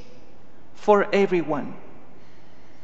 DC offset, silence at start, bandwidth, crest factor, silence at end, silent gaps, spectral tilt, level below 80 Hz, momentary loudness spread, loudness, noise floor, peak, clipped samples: 3%; 0.8 s; 7.8 kHz; 22 dB; 1.05 s; none; -6.5 dB/octave; -62 dBFS; 18 LU; -22 LUFS; -52 dBFS; -4 dBFS; under 0.1%